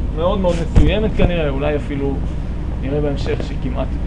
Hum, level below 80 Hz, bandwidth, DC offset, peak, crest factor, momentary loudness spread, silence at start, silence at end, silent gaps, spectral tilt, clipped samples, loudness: none; -20 dBFS; 10 kHz; under 0.1%; 0 dBFS; 16 dB; 8 LU; 0 s; 0 s; none; -7.5 dB/octave; under 0.1%; -19 LUFS